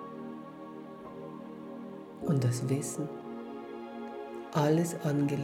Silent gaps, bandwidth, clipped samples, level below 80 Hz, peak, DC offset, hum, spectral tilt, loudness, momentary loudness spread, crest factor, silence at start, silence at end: none; 16.5 kHz; under 0.1%; -72 dBFS; -14 dBFS; under 0.1%; none; -6.5 dB/octave; -34 LUFS; 16 LU; 18 dB; 0 s; 0 s